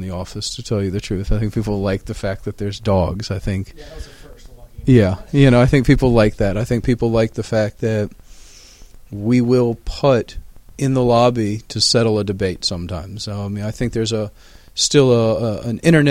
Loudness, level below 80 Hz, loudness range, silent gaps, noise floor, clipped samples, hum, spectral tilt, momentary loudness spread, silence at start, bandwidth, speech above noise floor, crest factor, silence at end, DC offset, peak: -18 LUFS; -32 dBFS; 6 LU; none; -42 dBFS; under 0.1%; none; -5.5 dB/octave; 13 LU; 0 s; 15 kHz; 25 dB; 18 dB; 0 s; under 0.1%; 0 dBFS